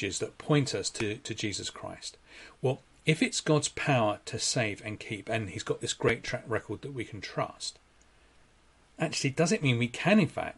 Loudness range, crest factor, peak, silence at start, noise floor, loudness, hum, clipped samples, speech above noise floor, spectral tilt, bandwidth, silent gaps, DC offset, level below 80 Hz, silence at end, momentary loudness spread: 5 LU; 22 dB; -10 dBFS; 0 s; -62 dBFS; -30 LUFS; none; under 0.1%; 32 dB; -4.5 dB/octave; 11.5 kHz; none; under 0.1%; -60 dBFS; 0.05 s; 12 LU